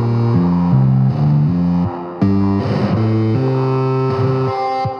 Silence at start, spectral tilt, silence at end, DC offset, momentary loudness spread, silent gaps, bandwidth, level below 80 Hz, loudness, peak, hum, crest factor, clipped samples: 0 s; -10 dB/octave; 0 s; under 0.1%; 4 LU; none; 6.2 kHz; -44 dBFS; -16 LUFS; -2 dBFS; none; 12 dB; under 0.1%